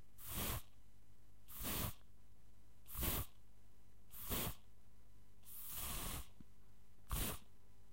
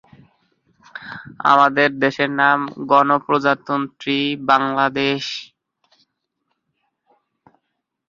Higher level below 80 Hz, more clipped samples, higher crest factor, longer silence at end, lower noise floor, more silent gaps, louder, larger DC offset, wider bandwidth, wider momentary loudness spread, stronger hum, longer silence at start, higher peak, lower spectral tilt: first, -54 dBFS vs -64 dBFS; neither; about the same, 22 dB vs 20 dB; second, 0.05 s vs 2.65 s; second, -68 dBFS vs -75 dBFS; neither; second, -45 LUFS vs -17 LUFS; first, 0.3% vs under 0.1%; first, 16 kHz vs 7.4 kHz; about the same, 15 LU vs 17 LU; first, 50 Hz at -70 dBFS vs none; second, 0.2 s vs 0.95 s; second, -26 dBFS vs 0 dBFS; second, -3 dB/octave vs -5 dB/octave